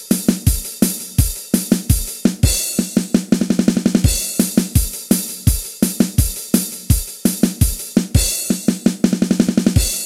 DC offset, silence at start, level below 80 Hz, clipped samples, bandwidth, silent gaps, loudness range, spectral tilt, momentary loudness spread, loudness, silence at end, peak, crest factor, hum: under 0.1%; 0 s; -26 dBFS; under 0.1%; 17 kHz; none; 1 LU; -5 dB/octave; 3 LU; -17 LUFS; 0 s; 0 dBFS; 16 dB; none